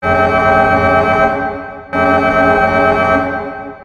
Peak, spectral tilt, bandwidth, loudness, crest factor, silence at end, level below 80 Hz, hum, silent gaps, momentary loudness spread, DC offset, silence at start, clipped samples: 0 dBFS; -7 dB/octave; 10.5 kHz; -12 LUFS; 12 dB; 0 s; -34 dBFS; none; none; 11 LU; under 0.1%; 0 s; under 0.1%